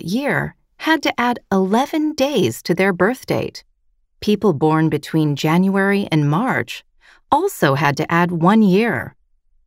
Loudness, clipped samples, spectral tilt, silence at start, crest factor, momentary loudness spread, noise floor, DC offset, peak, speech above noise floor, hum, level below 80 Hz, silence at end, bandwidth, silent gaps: -17 LUFS; under 0.1%; -6 dB/octave; 0 s; 16 dB; 8 LU; -61 dBFS; under 0.1%; -2 dBFS; 44 dB; none; -54 dBFS; 0.6 s; 16 kHz; none